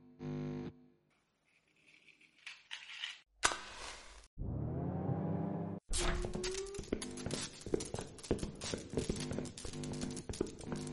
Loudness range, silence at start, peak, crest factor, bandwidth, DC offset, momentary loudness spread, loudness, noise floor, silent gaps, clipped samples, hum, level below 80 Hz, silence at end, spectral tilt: 4 LU; 0 s; -10 dBFS; 30 dB; 11.5 kHz; under 0.1%; 11 LU; -41 LUFS; -77 dBFS; 4.27-4.37 s; under 0.1%; none; -50 dBFS; 0 s; -4 dB/octave